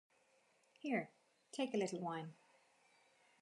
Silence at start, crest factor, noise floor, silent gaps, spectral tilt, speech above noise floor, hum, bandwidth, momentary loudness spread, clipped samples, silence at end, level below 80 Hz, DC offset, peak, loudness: 0.85 s; 20 dB; -76 dBFS; none; -5 dB/octave; 33 dB; none; 11.5 kHz; 13 LU; under 0.1%; 1.1 s; under -90 dBFS; under 0.1%; -26 dBFS; -43 LUFS